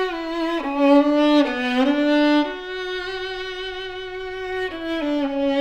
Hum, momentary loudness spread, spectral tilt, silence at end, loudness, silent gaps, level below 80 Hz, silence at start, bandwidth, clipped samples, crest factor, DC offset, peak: none; 13 LU; -4.5 dB/octave; 0 s; -21 LUFS; none; -48 dBFS; 0 s; 8.4 kHz; under 0.1%; 14 dB; under 0.1%; -6 dBFS